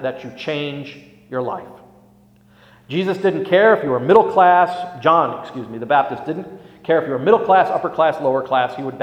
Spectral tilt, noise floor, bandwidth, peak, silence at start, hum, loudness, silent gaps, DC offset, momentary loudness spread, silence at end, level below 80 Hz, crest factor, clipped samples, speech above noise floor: -7 dB/octave; -51 dBFS; 9.2 kHz; 0 dBFS; 0 s; none; -17 LUFS; none; under 0.1%; 16 LU; 0 s; -62 dBFS; 18 dB; under 0.1%; 34 dB